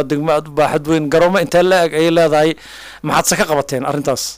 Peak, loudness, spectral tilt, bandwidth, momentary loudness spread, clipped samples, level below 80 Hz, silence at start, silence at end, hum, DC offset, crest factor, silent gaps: -4 dBFS; -14 LUFS; -4.5 dB/octave; 16 kHz; 6 LU; under 0.1%; -44 dBFS; 0 s; 0 s; none; under 0.1%; 10 dB; none